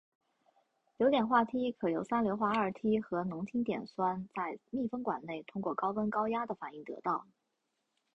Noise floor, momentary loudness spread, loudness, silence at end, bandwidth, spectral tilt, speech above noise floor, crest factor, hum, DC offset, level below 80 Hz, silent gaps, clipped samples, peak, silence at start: -83 dBFS; 10 LU; -34 LUFS; 0.95 s; 8 kHz; -7.5 dB/octave; 49 dB; 20 dB; none; under 0.1%; -72 dBFS; none; under 0.1%; -16 dBFS; 1 s